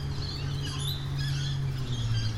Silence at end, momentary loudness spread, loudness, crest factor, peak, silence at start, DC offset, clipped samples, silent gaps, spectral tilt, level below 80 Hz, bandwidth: 0 s; 3 LU; -32 LUFS; 12 dB; -18 dBFS; 0 s; under 0.1%; under 0.1%; none; -5 dB/octave; -40 dBFS; 13 kHz